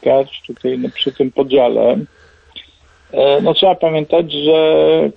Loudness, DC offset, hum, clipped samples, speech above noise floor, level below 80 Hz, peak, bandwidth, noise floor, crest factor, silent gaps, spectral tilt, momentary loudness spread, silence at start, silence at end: -14 LUFS; under 0.1%; none; under 0.1%; 32 dB; -52 dBFS; -2 dBFS; 5.2 kHz; -45 dBFS; 12 dB; none; -7.5 dB/octave; 10 LU; 0 s; 0.05 s